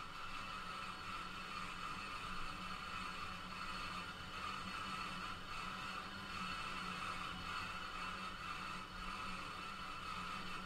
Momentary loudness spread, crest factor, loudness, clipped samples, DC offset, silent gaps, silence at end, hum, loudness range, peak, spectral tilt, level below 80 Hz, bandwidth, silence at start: 3 LU; 14 dB; -46 LUFS; under 0.1%; under 0.1%; none; 0 s; none; 1 LU; -32 dBFS; -3 dB/octave; -58 dBFS; 16 kHz; 0 s